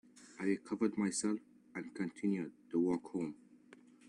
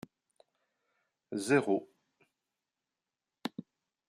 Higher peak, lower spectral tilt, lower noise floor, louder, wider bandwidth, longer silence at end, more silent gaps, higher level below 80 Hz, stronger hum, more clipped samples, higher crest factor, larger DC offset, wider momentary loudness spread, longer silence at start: second, -22 dBFS vs -14 dBFS; about the same, -5.5 dB/octave vs -5 dB/octave; second, -62 dBFS vs under -90 dBFS; second, -38 LUFS vs -33 LUFS; second, 11 kHz vs 14.5 kHz; first, 0.75 s vs 0.5 s; neither; about the same, -78 dBFS vs -82 dBFS; neither; neither; second, 18 dB vs 24 dB; neither; second, 12 LU vs 20 LU; second, 0.15 s vs 1.3 s